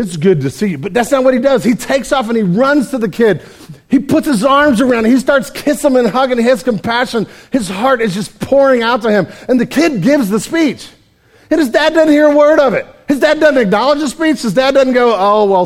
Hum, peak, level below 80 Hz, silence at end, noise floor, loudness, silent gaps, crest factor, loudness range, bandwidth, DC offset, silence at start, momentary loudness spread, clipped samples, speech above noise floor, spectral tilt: none; 0 dBFS; -44 dBFS; 0 s; -48 dBFS; -12 LUFS; none; 12 dB; 3 LU; 16.5 kHz; under 0.1%; 0 s; 7 LU; under 0.1%; 37 dB; -5.5 dB/octave